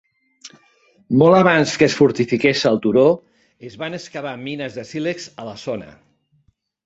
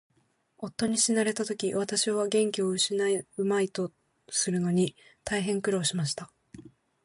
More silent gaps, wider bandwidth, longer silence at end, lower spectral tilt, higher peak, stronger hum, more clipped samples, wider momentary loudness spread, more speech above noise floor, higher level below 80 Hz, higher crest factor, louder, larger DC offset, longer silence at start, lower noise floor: neither; second, 8 kHz vs 11.5 kHz; first, 0.95 s vs 0.35 s; first, -5.5 dB/octave vs -4 dB/octave; first, -2 dBFS vs -12 dBFS; neither; neither; first, 17 LU vs 10 LU; about the same, 45 dB vs 42 dB; first, -58 dBFS vs -66 dBFS; about the same, 18 dB vs 18 dB; first, -18 LUFS vs -28 LUFS; neither; second, 0.45 s vs 0.6 s; second, -63 dBFS vs -70 dBFS